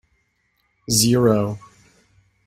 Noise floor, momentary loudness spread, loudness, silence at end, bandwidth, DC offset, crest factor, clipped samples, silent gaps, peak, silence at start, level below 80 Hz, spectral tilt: -68 dBFS; 21 LU; -18 LUFS; 0.9 s; 16 kHz; under 0.1%; 20 dB; under 0.1%; none; -2 dBFS; 0.9 s; -52 dBFS; -4.5 dB/octave